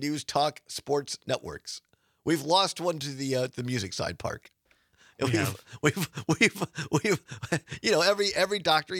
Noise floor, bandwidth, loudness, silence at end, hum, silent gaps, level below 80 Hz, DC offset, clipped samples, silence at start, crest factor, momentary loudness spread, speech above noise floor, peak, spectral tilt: -64 dBFS; 19 kHz; -28 LUFS; 0 s; none; none; -64 dBFS; under 0.1%; under 0.1%; 0 s; 22 dB; 12 LU; 36 dB; -6 dBFS; -4 dB/octave